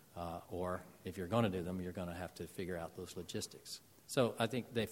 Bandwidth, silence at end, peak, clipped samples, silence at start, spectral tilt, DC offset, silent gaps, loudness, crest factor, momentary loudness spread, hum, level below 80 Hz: 16.5 kHz; 0 s; -18 dBFS; under 0.1%; 0.15 s; -5.5 dB/octave; under 0.1%; none; -41 LUFS; 22 dB; 12 LU; none; -66 dBFS